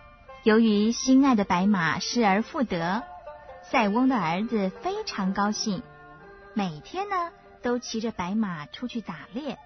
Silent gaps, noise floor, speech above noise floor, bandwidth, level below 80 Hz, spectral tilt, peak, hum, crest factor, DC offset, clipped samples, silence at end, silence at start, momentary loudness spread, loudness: none; -48 dBFS; 23 dB; 6.4 kHz; -56 dBFS; -5 dB/octave; -8 dBFS; none; 18 dB; under 0.1%; under 0.1%; 0.05 s; 0.3 s; 14 LU; -26 LUFS